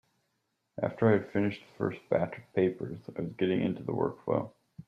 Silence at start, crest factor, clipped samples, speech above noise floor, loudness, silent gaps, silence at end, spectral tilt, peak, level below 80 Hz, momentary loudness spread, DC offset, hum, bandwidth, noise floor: 0.75 s; 20 dB; under 0.1%; 49 dB; -31 LUFS; none; 0.05 s; -9 dB/octave; -12 dBFS; -68 dBFS; 12 LU; under 0.1%; none; 7 kHz; -79 dBFS